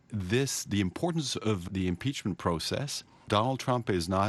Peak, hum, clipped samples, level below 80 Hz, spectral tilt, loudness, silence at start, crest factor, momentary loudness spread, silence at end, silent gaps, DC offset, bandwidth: -10 dBFS; none; under 0.1%; -56 dBFS; -5 dB/octave; -31 LUFS; 0.1 s; 20 dB; 4 LU; 0 s; none; under 0.1%; 12.5 kHz